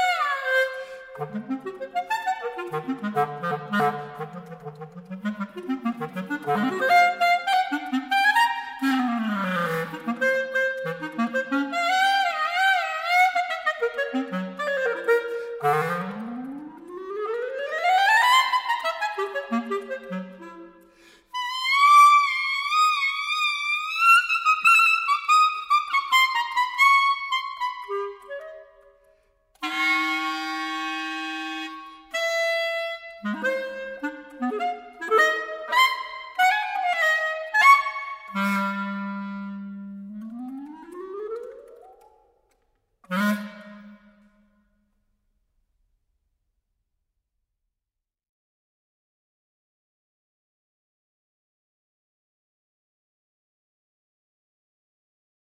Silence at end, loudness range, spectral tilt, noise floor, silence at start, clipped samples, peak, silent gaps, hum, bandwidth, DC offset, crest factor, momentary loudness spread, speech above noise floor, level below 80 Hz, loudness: 11.45 s; 14 LU; -3.5 dB/octave; -87 dBFS; 0 s; under 0.1%; -4 dBFS; none; none; 16 kHz; under 0.1%; 22 dB; 19 LU; 58 dB; -72 dBFS; -22 LUFS